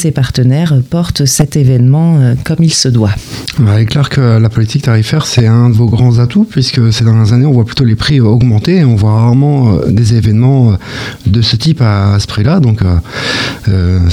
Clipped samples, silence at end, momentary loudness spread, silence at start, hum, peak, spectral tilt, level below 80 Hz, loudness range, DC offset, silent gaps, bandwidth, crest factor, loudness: under 0.1%; 0 s; 5 LU; 0 s; none; 0 dBFS; -6 dB/octave; -30 dBFS; 2 LU; under 0.1%; none; 14 kHz; 8 dB; -9 LUFS